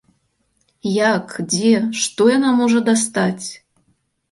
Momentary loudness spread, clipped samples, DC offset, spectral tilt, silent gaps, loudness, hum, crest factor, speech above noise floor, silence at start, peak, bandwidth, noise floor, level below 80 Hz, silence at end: 8 LU; under 0.1%; under 0.1%; -4 dB/octave; none; -17 LUFS; none; 16 dB; 49 dB; 0.85 s; -2 dBFS; 11.5 kHz; -66 dBFS; -62 dBFS; 0.75 s